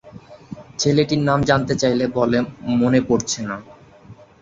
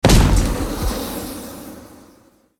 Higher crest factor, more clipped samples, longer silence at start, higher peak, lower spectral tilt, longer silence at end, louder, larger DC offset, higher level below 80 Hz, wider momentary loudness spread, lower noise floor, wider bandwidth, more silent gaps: about the same, 18 dB vs 18 dB; neither; about the same, 0.05 s vs 0.05 s; about the same, -2 dBFS vs 0 dBFS; about the same, -5 dB/octave vs -5 dB/octave; second, 0.3 s vs 0.75 s; about the same, -19 LUFS vs -20 LUFS; neither; second, -48 dBFS vs -22 dBFS; second, 15 LU vs 22 LU; second, -45 dBFS vs -52 dBFS; second, 7.8 kHz vs 18.5 kHz; neither